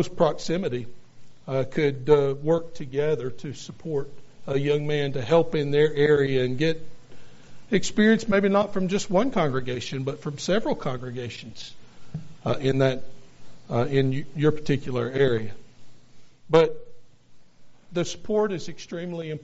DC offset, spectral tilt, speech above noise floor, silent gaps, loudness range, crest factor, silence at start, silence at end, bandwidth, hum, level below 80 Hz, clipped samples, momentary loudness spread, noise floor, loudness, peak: under 0.1%; -5.5 dB/octave; 24 dB; none; 5 LU; 22 dB; 0 s; 0 s; 8 kHz; none; -52 dBFS; under 0.1%; 15 LU; -47 dBFS; -25 LUFS; -2 dBFS